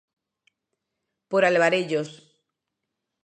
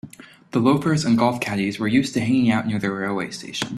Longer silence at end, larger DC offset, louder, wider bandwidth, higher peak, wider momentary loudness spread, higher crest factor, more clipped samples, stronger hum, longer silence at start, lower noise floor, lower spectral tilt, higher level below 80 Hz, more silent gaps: first, 1.1 s vs 0 s; neither; about the same, -22 LUFS vs -21 LUFS; second, 9.6 kHz vs 13.5 kHz; about the same, -6 dBFS vs -4 dBFS; about the same, 10 LU vs 9 LU; about the same, 20 dB vs 18 dB; neither; neither; first, 1.3 s vs 0.05 s; first, -83 dBFS vs -43 dBFS; about the same, -5 dB/octave vs -5.5 dB/octave; second, -82 dBFS vs -56 dBFS; neither